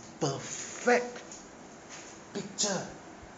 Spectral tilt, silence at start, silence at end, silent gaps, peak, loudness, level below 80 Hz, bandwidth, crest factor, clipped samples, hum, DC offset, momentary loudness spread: -3 dB/octave; 0 s; 0 s; none; -14 dBFS; -32 LUFS; -66 dBFS; 9.4 kHz; 20 dB; under 0.1%; none; under 0.1%; 19 LU